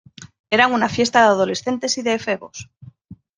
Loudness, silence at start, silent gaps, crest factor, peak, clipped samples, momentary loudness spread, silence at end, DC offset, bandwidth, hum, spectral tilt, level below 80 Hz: -18 LUFS; 0.2 s; 0.39-0.44 s; 18 dB; -2 dBFS; under 0.1%; 12 LU; 0.25 s; under 0.1%; 10 kHz; none; -3.5 dB/octave; -60 dBFS